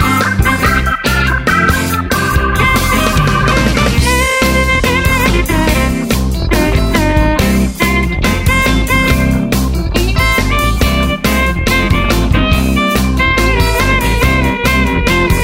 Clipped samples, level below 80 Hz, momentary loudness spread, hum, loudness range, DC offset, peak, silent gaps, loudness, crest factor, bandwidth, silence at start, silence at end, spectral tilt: under 0.1%; -16 dBFS; 3 LU; none; 1 LU; under 0.1%; 0 dBFS; none; -12 LUFS; 12 dB; 16.5 kHz; 0 s; 0 s; -5 dB/octave